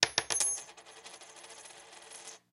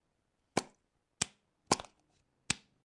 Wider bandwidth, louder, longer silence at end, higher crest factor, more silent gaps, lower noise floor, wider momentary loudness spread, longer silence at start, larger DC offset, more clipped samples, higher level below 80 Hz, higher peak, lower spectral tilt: first, 15.5 kHz vs 11.5 kHz; first, -30 LUFS vs -37 LUFS; second, 0.15 s vs 0.4 s; about the same, 34 dB vs 34 dB; neither; second, -52 dBFS vs -80 dBFS; first, 21 LU vs 4 LU; second, 0 s vs 0.55 s; neither; neither; second, -74 dBFS vs -68 dBFS; first, -2 dBFS vs -8 dBFS; second, 1 dB/octave vs -2.5 dB/octave